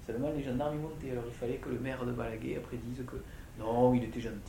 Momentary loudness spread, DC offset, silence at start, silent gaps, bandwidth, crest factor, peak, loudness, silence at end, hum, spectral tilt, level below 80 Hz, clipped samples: 13 LU; under 0.1%; 0 s; none; 16.5 kHz; 20 dB; -16 dBFS; -35 LUFS; 0 s; none; -7.5 dB/octave; -50 dBFS; under 0.1%